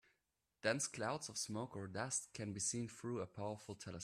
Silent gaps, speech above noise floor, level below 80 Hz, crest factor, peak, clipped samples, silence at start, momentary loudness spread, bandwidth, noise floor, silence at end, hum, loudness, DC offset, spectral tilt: none; 43 dB; -78 dBFS; 24 dB; -22 dBFS; under 0.1%; 0.65 s; 7 LU; 15 kHz; -87 dBFS; 0 s; none; -43 LUFS; under 0.1%; -3.5 dB/octave